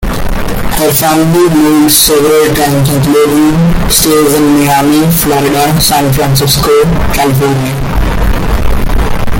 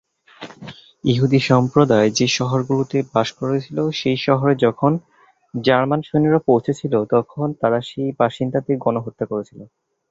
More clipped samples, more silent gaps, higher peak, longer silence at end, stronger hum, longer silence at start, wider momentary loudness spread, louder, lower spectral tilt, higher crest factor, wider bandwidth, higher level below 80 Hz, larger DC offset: first, 0.2% vs under 0.1%; neither; about the same, 0 dBFS vs -2 dBFS; second, 0 s vs 0.45 s; neither; second, 0 s vs 0.4 s; second, 8 LU vs 11 LU; first, -8 LUFS vs -19 LUFS; second, -4.5 dB/octave vs -6 dB/octave; second, 8 dB vs 18 dB; first, over 20 kHz vs 7.8 kHz; first, -16 dBFS vs -56 dBFS; neither